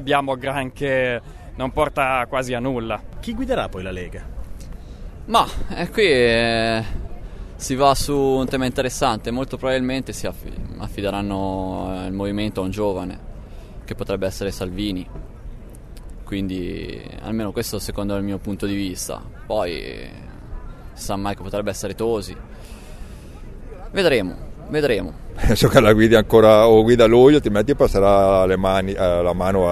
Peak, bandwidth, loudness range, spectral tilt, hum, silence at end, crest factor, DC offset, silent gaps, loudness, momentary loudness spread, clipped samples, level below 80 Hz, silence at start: 0 dBFS; 13.5 kHz; 14 LU; -5.5 dB/octave; none; 0 s; 20 dB; under 0.1%; none; -19 LUFS; 25 LU; under 0.1%; -34 dBFS; 0 s